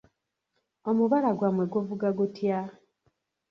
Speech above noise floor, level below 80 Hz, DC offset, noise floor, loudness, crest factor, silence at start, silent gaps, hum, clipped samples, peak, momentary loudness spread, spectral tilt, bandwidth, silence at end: 53 dB; -72 dBFS; under 0.1%; -79 dBFS; -27 LUFS; 16 dB; 0.85 s; none; none; under 0.1%; -12 dBFS; 9 LU; -9.5 dB/octave; 6.6 kHz; 0.8 s